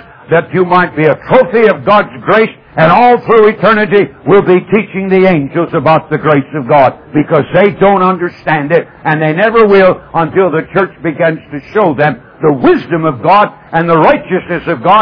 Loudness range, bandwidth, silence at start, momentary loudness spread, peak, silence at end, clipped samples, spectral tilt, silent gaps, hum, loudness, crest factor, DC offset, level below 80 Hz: 3 LU; 5.4 kHz; 0.3 s; 7 LU; 0 dBFS; 0 s; 0.8%; -9.5 dB/octave; none; none; -9 LUFS; 8 dB; under 0.1%; -44 dBFS